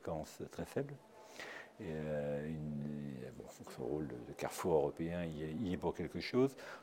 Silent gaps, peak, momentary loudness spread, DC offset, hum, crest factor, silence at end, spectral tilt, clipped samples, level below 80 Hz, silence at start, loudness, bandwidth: none; -20 dBFS; 14 LU; under 0.1%; none; 20 dB; 0 s; -6.5 dB/octave; under 0.1%; -64 dBFS; 0 s; -41 LUFS; 16.5 kHz